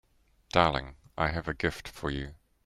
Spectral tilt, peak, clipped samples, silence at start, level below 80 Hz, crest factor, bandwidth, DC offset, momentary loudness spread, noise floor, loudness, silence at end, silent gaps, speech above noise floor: -5.5 dB/octave; -8 dBFS; under 0.1%; 0.55 s; -46 dBFS; 24 dB; 15.5 kHz; under 0.1%; 13 LU; -59 dBFS; -31 LUFS; 0.3 s; none; 29 dB